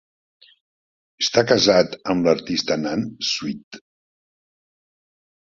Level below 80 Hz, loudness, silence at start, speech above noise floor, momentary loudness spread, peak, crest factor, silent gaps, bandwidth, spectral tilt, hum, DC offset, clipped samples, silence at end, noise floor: -58 dBFS; -20 LUFS; 1.2 s; over 70 dB; 10 LU; -2 dBFS; 22 dB; 3.63-3.71 s; 7.6 kHz; -4 dB/octave; none; under 0.1%; under 0.1%; 1.8 s; under -90 dBFS